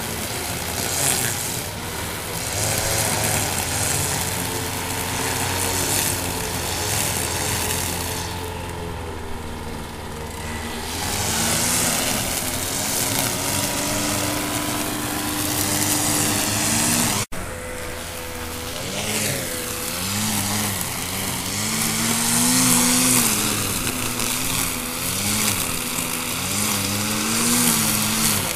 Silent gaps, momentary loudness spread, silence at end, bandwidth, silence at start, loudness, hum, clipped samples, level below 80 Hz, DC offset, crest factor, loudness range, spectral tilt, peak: none; 12 LU; 0 s; 16 kHz; 0 s; -21 LUFS; none; under 0.1%; -40 dBFS; under 0.1%; 22 dB; 6 LU; -2.5 dB/octave; -2 dBFS